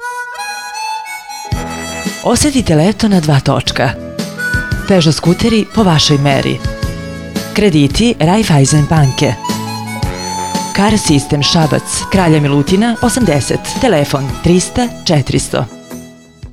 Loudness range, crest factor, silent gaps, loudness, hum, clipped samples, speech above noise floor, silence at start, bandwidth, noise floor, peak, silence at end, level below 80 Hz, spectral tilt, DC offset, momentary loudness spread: 2 LU; 12 dB; none; -12 LUFS; none; under 0.1%; 22 dB; 0 s; 15.5 kHz; -33 dBFS; 0 dBFS; 0 s; -30 dBFS; -5 dB/octave; under 0.1%; 12 LU